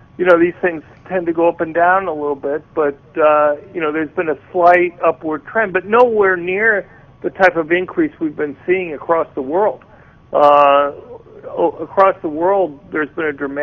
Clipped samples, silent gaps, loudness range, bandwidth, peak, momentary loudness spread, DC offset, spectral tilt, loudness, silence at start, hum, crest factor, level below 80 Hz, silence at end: under 0.1%; none; 2 LU; 6.6 kHz; 0 dBFS; 10 LU; under 0.1%; -7.5 dB/octave; -16 LUFS; 0.2 s; none; 16 dB; -54 dBFS; 0 s